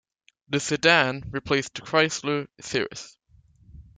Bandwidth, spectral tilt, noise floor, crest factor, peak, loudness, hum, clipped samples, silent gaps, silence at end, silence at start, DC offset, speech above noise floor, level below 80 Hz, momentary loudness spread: 9.6 kHz; -3.5 dB/octave; -58 dBFS; 22 dB; -4 dBFS; -24 LUFS; none; under 0.1%; none; 0.15 s; 0.5 s; under 0.1%; 33 dB; -56 dBFS; 14 LU